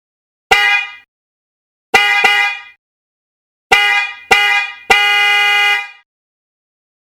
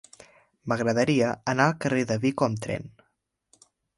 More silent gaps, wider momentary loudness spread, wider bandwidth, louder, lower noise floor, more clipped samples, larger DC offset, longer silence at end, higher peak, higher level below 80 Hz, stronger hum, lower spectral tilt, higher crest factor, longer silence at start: first, 1.08-1.93 s, 2.78-3.70 s vs none; second, 8 LU vs 11 LU; first, 18.5 kHz vs 11.5 kHz; first, -11 LUFS vs -25 LUFS; first, under -90 dBFS vs -75 dBFS; neither; neither; about the same, 1.1 s vs 1.1 s; first, 0 dBFS vs -6 dBFS; first, -48 dBFS vs -62 dBFS; neither; second, 0.5 dB/octave vs -6 dB/octave; second, 16 dB vs 22 dB; second, 0.5 s vs 0.65 s